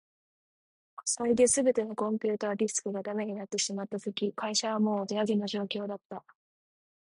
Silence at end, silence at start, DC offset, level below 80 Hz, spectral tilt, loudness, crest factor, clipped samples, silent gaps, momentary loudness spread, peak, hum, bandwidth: 0.95 s; 1 s; under 0.1%; -72 dBFS; -3.5 dB/octave; -30 LUFS; 18 dB; under 0.1%; 6.05-6.10 s; 11 LU; -12 dBFS; none; 11.5 kHz